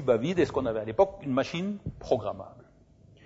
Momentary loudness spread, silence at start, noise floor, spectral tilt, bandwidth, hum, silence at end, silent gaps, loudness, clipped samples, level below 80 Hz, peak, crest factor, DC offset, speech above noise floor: 12 LU; 0 s; -57 dBFS; -7 dB/octave; 8 kHz; none; 0.65 s; none; -29 LUFS; under 0.1%; -54 dBFS; -10 dBFS; 20 dB; under 0.1%; 29 dB